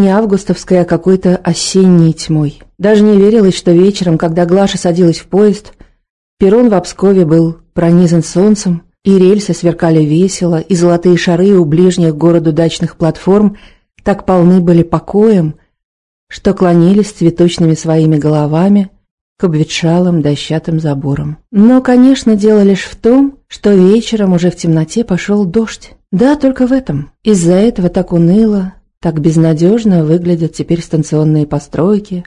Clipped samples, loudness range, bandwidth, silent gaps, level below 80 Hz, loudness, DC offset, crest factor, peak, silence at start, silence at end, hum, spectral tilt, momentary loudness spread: 2%; 3 LU; 11 kHz; 6.10-6.37 s, 15.84-16.27 s, 19.11-19.36 s; -38 dBFS; -10 LUFS; 0.2%; 10 dB; 0 dBFS; 0 s; 0.05 s; none; -7 dB/octave; 8 LU